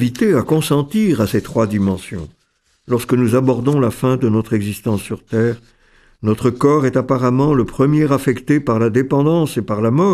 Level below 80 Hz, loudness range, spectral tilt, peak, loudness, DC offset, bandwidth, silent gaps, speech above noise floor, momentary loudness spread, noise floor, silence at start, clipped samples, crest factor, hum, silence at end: -44 dBFS; 3 LU; -7.5 dB/octave; 0 dBFS; -16 LUFS; under 0.1%; 14.5 kHz; none; 46 dB; 7 LU; -62 dBFS; 0 s; under 0.1%; 16 dB; none; 0 s